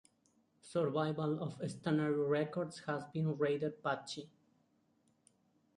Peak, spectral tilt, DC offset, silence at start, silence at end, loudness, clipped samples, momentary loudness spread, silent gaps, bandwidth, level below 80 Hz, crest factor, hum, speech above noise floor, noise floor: -22 dBFS; -7 dB/octave; under 0.1%; 0.65 s; 1.5 s; -37 LUFS; under 0.1%; 7 LU; none; 11.5 kHz; -78 dBFS; 16 dB; none; 39 dB; -75 dBFS